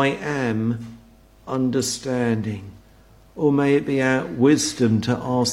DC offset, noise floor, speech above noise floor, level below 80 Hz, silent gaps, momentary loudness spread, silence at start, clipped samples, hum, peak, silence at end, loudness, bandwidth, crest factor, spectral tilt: under 0.1%; -51 dBFS; 30 dB; -54 dBFS; none; 11 LU; 0 s; under 0.1%; none; -4 dBFS; 0 s; -21 LUFS; 15.5 kHz; 16 dB; -5 dB/octave